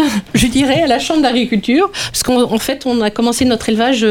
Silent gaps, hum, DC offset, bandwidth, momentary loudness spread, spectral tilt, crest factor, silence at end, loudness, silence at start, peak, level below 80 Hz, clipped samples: none; none; under 0.1%; 18 kHz; 3 LU; -4 dB/octave; 12 dB; 0 s; -14 LUFS; 0 s; 0 dBFS; -36 dBFS; under 0.1%